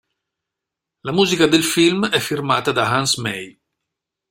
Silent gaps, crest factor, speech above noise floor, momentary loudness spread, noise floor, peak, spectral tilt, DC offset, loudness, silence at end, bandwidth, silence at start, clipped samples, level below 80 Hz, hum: none; 18 dB; 66 dB; 13 LU; -84 dBFS; -2 dBFS; -3.5 dB/octave; under 0.1%; -17 LUFS; 0.8 s; 16.5 kHz; 1.05 s; under 0.1%; -56 dBFS; none